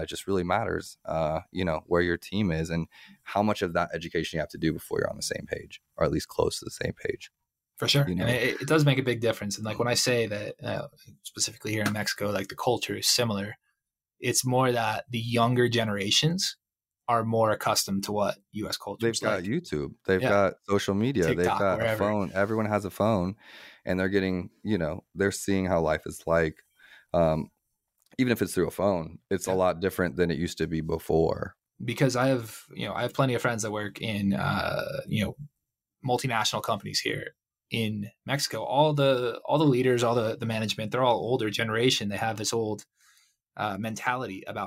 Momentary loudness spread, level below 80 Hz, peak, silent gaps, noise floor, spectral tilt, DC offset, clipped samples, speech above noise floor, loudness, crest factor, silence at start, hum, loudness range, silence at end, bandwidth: 10 LU; -54 dBFS; -10 dBFS; none; -83 dBFS; -4.5 dB/octave; under 0.1%; under 0.1%; 56 dB; -27 LUFS; 18 dB; 0 s; none; 4 LU; 0 s; 16 kHz